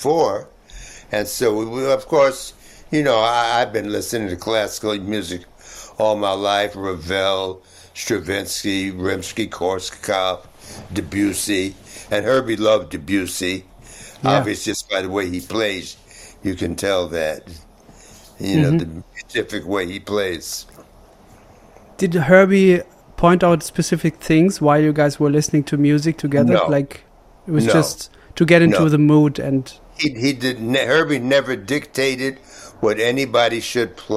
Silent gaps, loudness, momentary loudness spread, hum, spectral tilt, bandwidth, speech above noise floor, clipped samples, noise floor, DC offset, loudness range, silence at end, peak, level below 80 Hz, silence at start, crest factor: none; -19 LUFS; 15 LU; none; -5 dB/octave; 16 kHz; 28 dB; under 0.1%; -47 dBFS; under 0.1%; 7 LU; 0 s; 0 dBFS; -48 dBFS; 0 s; 18 dB